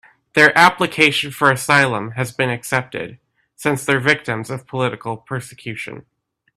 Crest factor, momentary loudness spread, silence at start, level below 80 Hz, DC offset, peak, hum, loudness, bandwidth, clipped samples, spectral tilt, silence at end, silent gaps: 18 dB; 16 LU; 0.35 s; -58 dBFS; under 0.1%; 0 dBFS; none; -17 LUFS; 15 kHz; under 0.1%; -4 dB/octave; 0.55 s; none